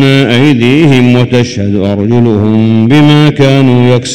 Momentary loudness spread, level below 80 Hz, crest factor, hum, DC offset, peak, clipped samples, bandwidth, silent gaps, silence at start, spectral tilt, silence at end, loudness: 5 LU; -40 dBFS; 6 dB; none; 3%; 0 dBFS; 10%; 11.5 kHz; none; 0 s; -6.5 dB/octave; 0 s; -7 LUFS